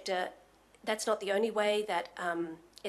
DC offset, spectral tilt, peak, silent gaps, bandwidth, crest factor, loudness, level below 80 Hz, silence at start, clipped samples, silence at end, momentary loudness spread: under 0.1%; -3 dB/octave; -16 dBFS; none; 13 kHz; 18 dB; -33 LUFS; -74 dBFS; 0 s; under 0.1%; 0 s; 11 LU